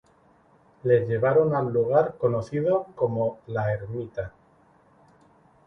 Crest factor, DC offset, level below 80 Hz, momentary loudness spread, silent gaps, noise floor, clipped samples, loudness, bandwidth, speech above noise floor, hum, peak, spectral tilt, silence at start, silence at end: 18 dB; under 0.1%; -58 dBFS; 11 LU; none; -59 dBFS; under 0.1%; -25 LUFS; 6.6 kHz; 36 dB; none; -8 dBFS; -9.5 dB/octave; 0.85 s; 1.4 s